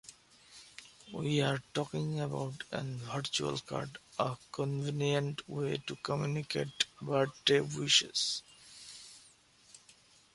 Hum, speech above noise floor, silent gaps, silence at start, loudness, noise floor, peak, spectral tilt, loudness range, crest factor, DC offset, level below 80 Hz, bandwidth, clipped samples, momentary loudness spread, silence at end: none; 29 dB; none; 0.05 s; -34 LUFS; -63 dBFS; -10 dBFS; -4 dB/octave; 5 LU; 26 dB; under 0.1%; -70 dBFS; 11.5 kHz; under 0.1%; 21 LU; 0.6 s